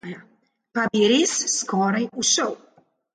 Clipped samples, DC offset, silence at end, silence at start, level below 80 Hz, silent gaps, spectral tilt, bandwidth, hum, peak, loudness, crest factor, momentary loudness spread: under 0.1%; under 0.1%; 0.6 s; 0.05 s; -68 dBFS; none; -2.5 dB/octave; 10 kHz; none; -8 dBFS; -21 LUFS; 16 dB; 18 LU